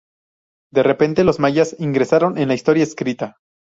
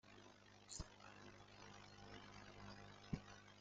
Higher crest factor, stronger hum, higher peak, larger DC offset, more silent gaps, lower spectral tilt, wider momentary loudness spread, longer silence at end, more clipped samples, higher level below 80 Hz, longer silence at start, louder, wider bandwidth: second, 16 dB vs 26 dB; second, none vs 50 Hz at -65 dBFS; first, -2 dBFS vs -32 dBFS; neither; neither; first, -6.5 dB/octave vs -4 dB/octave; second, 8 LU vs 11 LU; first, 0.5 s vs 0 s; neither; first, -50 dBFS vs -68 dBFS; first, 0.75 s vs 0.05 s; first, -17 LUFS vs -58 LUFS; second, 7.8 kHz vs 8.8 kHz